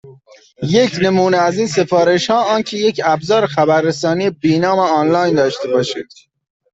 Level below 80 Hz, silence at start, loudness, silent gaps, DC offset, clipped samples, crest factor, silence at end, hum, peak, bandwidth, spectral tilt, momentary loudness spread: -56 dBFS; 0.05 s; -15 LUFS; none; under 0.1%; under 0.1%; 14 dB; 0.7 s; none; -2 dBFS; 8 kHz; -5.5 dB/octave; 4 LU